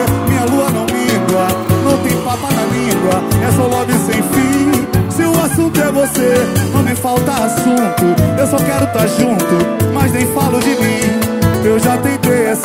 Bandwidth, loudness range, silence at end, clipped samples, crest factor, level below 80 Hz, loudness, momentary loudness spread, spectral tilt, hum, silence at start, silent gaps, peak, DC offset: 16.5 kHz; 1 LU; 0 s; under 0.1%; 12 dB; -36 dBFS; -13 LUFS; 2 LU; -5.5 dB/octave; none; 0 s; none; 0 dBFS; under 0.1%